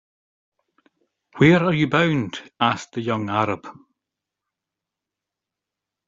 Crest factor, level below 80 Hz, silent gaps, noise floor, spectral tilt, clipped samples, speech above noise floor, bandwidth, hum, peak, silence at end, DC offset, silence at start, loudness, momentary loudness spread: 22 dB; -58 dBFS; none; -86 dBFS; -5 dB/octave; under 0.1%; 66 dB; 7.6 kHz; none; -2 dBFS; 2.35 s; under 0.1%; 1.35 s; -20 LUFS; 11 LU